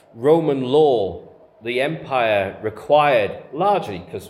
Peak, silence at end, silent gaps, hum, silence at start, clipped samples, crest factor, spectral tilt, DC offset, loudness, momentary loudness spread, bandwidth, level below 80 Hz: -2 dBFS; 0 s; none; none; 0.15 s; under 0.1%; 16 dB; -6.5 dB/octave; under 0.1%; -19 LUFS; 12 LU; 13 kHz; -60 dBFS